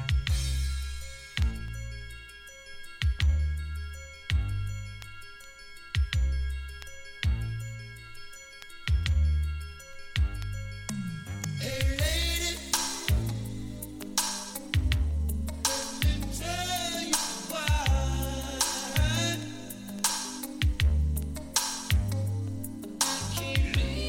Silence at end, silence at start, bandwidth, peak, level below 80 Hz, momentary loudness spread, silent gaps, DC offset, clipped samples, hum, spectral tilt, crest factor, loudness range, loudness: 0 s; 0 s; 17 kHz; -12 dBFS; -32 dBFS; 16 LU; none; under 0.1%; under 0.1%; none; -3.5 dB/octave; 18 dB; 5 LU; -30 LUFS